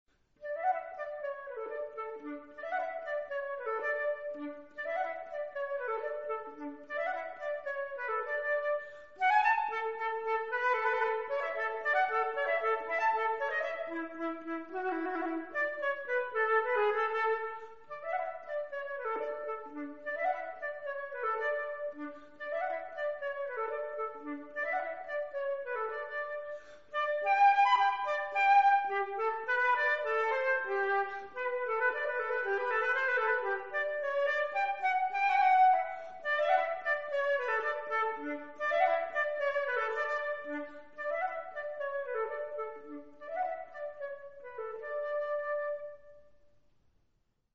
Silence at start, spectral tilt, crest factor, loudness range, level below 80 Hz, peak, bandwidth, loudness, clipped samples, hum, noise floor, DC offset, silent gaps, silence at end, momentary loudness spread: 0.05 s; 1 dB/octave; 18 dB; 9 LU; -76 dBFS; -16 dBFS; 7.6 kHz; -33 LUFS; under 0.1%; none; -76 dBFS; 0.2%; none; 0 s; 13 LU